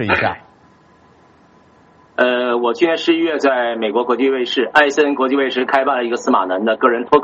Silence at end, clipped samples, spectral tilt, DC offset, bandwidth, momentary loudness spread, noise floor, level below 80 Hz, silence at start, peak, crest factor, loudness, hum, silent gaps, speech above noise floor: 0 s; under 0.1%; -2 dB/octave; under 0.1%; 8 kHz; 5 LU; -49 dBFS; -58 dBFS; 0 s; 0 dBFS; 16 dB; -16 LUFS; none; none; 34 dB